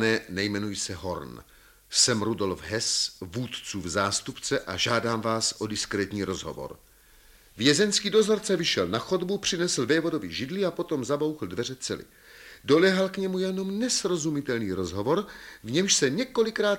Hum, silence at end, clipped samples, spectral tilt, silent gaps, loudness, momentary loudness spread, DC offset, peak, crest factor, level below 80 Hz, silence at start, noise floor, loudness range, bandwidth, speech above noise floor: none; 0 s; under 0.1%; -3.5 dB/octave; none; -26 LUFS; 12 LU; under 0.1%; -4 dBFS; 22 dB; -58 dBFS; 0 s; -55 dBFS; 3 LU; 17 kHz; 29 dB